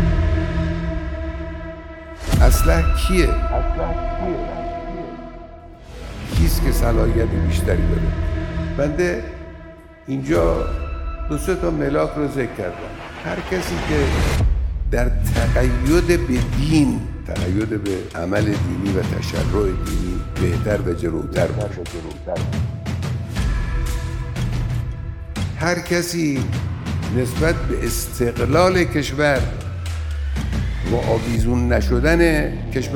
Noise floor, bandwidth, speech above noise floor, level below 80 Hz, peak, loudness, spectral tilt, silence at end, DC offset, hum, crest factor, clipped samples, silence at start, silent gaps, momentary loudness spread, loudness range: -40 dBFS; 17.5 kHz; 21 dB; -24 dBFS; 0 dBFS; -21 LUFS; -6 dB/octave; 0 s; under 0.1%; none; 20 dB; under 0.1%; 0 s; none; 12 LU; 4 LU